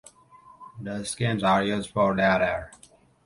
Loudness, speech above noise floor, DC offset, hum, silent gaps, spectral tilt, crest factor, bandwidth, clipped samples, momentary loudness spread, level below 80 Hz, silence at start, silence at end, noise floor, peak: -25 LUFS; 29 dB; under 0.1%; none; none; -5 dB/octave; 18 dB; 11.5 kHz; under 0.1%; 13 LU; -54 dBFS; 0.6 s; 0.6 s; -53 dBFS; -8 dBFS